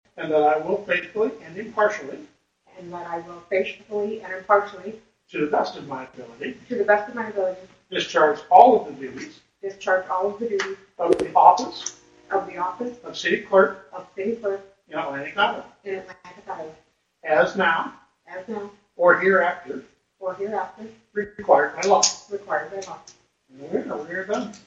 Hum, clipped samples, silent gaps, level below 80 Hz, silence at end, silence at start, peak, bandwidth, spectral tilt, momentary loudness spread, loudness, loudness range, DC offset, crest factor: none; under 0.1%; none; -66 dBFS; 0.1 s; 0.15 s; 0 dBFS; 10 kHz; -3 dB/octave; 19 LU; -22 LUFS; 7 LU; under 0.1%; 24 dB